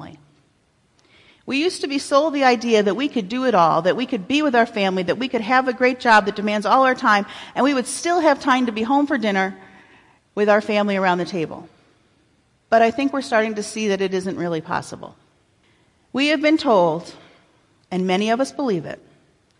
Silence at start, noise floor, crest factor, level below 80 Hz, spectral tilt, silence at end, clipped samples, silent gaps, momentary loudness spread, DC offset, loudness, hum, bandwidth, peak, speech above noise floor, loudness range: 0 s; -62 dBFS; 18 dB; -64 dBFS; -4.5 dB/octave; 0.65 s; under 0.1%; none; 10 LU; under 0.1%; -19 LUFS; none; 11.5 kHz; -4 dBFS; 43 dB; 5 LU